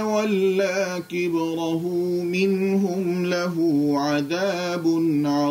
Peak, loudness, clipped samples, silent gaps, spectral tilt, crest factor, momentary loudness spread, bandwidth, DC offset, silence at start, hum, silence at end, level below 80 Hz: -10 dBFS; -23 LUFS; under 0.1%; none; -6 dB/octave; 12 dB; 4 LU; 16 kHz; under 0.1%; 0 s; none; 0 s; -66 dBFS